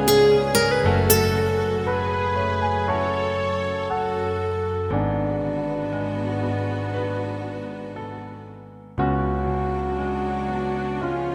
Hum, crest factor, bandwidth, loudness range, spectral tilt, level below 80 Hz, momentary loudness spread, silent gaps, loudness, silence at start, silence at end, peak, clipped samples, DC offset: none; 20 dB; 16 kHz; 6 LU; -5.5 dB/octave; -38 dBFS; 14 LU; none; -23 LUFS; 0 s; 0 s; -2 dBFS; under 0.1%; under 0.1%